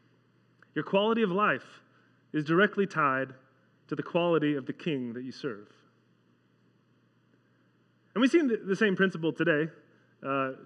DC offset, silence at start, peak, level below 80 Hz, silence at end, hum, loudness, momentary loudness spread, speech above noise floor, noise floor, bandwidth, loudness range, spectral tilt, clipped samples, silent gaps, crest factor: under 0.1%; 0.75 s; -10 dBFS; under -90 dBFS; 0 s; none; -29 LUFS; 13 LU; 39 dB; -67 dBFS; 9.6 kHz; 9 LU; -6.5 dB/octave; under 0.1%; none; 20 dB